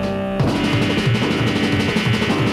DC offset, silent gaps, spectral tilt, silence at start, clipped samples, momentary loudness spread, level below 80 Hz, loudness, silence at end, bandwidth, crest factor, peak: under 0.1%; none; -6 dB/octave; 0 s; under 0.1%; 2 LU; -40 dBFS; -18 LUFS; 0 s; 14.5 kHz; 12 dB; -6 dBFS